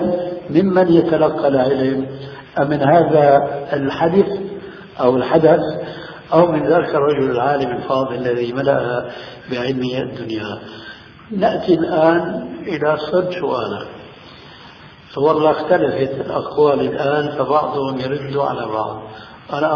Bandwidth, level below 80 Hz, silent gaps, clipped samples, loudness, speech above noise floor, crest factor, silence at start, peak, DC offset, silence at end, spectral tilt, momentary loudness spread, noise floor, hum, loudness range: 5.4 kHz; -52 dBFS; none; under 0.1%; -17 LUFS; 24 dB; 18 dB; 0 s; 0 dBFS; under 0.1%; 0 s; -8.5 dB/octave; 15 LU; -40 dBFS; none; 6 LU